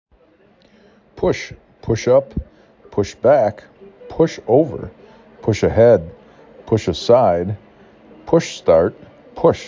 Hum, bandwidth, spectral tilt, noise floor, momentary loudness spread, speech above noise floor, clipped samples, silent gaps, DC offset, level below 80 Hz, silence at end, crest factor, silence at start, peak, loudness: none; 7.6 kHz; -6.5 dB/octave; -53 dBFS; 18 LU; 38 dB; under 0.1%; none; under 0.1%; -40 dBFS; 0 s; 18 dB; 1.15 s; 0 dBFS; -17 LUFS